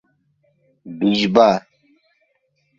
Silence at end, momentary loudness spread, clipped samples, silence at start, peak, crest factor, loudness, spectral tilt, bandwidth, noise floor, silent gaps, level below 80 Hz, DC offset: 1.2 s; 12 LU; under 0.1%; 0.85 s; 0 dBFS; 20 dB; -17 LUFS; -6 dB/octave; 7.4 kHz; -67 dBFS; none; -58 dBFS; under 0.1%